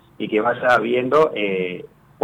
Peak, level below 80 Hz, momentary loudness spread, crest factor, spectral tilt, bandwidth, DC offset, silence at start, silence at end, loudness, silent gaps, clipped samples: -6 dBFS; -60 dBFS; 9 LU; 14 dB; -6 dB/octave; 11 kHz; under 0.1%; 0.2 s; 0.4 s; -19 LUFS; none; under 0.1%